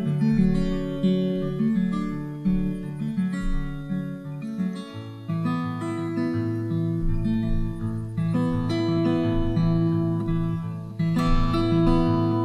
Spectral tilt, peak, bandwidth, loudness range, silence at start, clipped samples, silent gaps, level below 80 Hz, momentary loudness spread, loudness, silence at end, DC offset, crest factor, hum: -8.5 dB/octave; -8 dBFS; 10.5 kHz; 6 LU; 0 s; under 0.1%; none; -32 dBFS; 9 LU; -25 LUFS; 0 s; under 0.1%; 16 dB; none